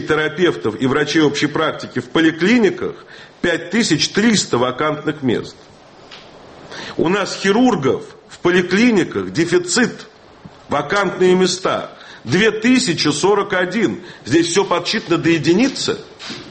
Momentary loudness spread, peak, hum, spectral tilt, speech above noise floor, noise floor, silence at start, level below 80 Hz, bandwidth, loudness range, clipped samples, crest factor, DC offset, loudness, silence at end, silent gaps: 12 LU; -2 dBFS; none; -4.5 dB/octave; 25 dB; -41 dBFS; 0 s; -52 dBFS; 8.8 kHz; 4 LU; under 0.1%; 14 dB; under 0.1%; -16 LUFS; 0 s; none